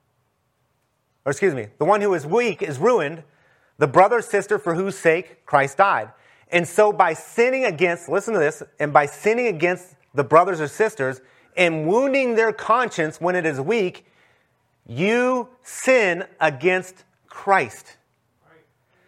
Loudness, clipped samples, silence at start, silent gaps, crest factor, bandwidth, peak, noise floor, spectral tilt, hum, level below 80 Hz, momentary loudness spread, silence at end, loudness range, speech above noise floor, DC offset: -20 LUFS; under 0.1%; 1.25 s; none; 20 dB; 15 kHz; 0 dBFS; -69 dBFS; -5 dB/octave; none; -70 dBFS; 10 LU; 1.25 s; 3 LU; 49 dB; under 0.1%